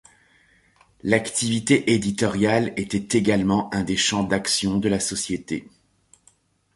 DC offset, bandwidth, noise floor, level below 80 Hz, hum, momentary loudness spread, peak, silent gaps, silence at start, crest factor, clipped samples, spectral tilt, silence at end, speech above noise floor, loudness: under 0.1%; 11.5 kHz; -61 dBFS; -50 dBFS; none; 7 LU; -2 dBFS; none; 1.05 s; 22 dB; under 0.1%; -4 dB/octave; 1.1 s; 39 dB; -22 LUFS